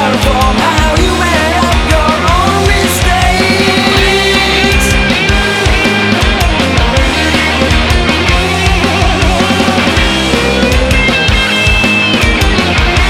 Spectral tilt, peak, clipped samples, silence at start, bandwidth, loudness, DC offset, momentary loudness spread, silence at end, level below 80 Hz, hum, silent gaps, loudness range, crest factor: -4 dB/octave; 0 dBFS; under 0.1%; 0 s; 17 kHz; -9 LUFS; under 0.1%; 2 LU; 0 s; -16 dBFS; none; none; 1 LU; 10 dB